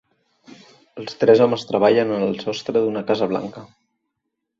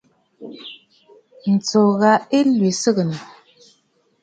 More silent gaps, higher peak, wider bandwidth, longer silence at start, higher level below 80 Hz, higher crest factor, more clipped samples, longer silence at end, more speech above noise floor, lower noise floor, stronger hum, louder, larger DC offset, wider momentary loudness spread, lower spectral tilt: neither; about the same, -2 dBFS vs -2 dBFS; second, 7.4 kHz vs 9.2 kHz; first, 0.95 s vs 0.4 s; about the same, -64 dBFS vs -68 dBFS; about the same, 20 dB vs 18 dB; neither; about the same, 0.95 s vs 1 s; first, 59 dB vs 46 dB; first, -78 dBFS vs -63 dBFS; neither; about the same, -19 LUFS vs -17 LUFS; neither; second, 14 LU vs 21 LU; about the same, -6 dB/octave vs -5.5 dB/octave